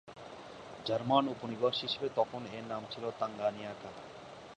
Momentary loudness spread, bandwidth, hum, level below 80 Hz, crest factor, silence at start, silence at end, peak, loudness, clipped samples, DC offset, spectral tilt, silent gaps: 19 LU; 10 kHz; none; -72 dBFS; 24 dB; 0.05 s; 0.05 s; -14 dBFS; -35 LUFS; under 0.1%; under 0.1%; -5.5 dB/octave; none